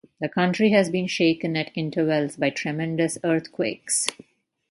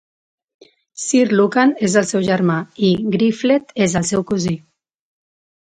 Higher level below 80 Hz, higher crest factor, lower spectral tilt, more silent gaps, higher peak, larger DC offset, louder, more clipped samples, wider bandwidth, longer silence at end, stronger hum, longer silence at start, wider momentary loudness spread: second, -68 dBFS vs -54 dBFS; about the same, 22 dB vs 18 dB; about the same, -4.5 dB/octave vs -5 dB/octave; neither; about the same, -2 dBFS vs 0 dBFS; neither; second, -23 LUFS vs -17 LUFS; neither; first, 11.5 kHz vs 9.6 kHz; second, 0.55 s vs 1.1 s; neither; second, 0.2 s vs 1 s; about the same, 8 LU vs 7 LU